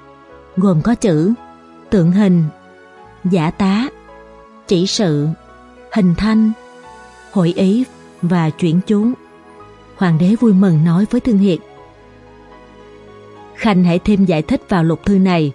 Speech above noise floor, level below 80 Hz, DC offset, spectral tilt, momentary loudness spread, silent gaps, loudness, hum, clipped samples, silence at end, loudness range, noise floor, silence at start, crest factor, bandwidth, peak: 28 dB; -42 dBFS; under 0.1%; -7 dB/octave; 10 LU; none; -15 LUFS; none; under 0.1%; 0 s; 3 LU; -41 dBFS; 0.55 s; 14 dB; 11 kHz; -2 dBFS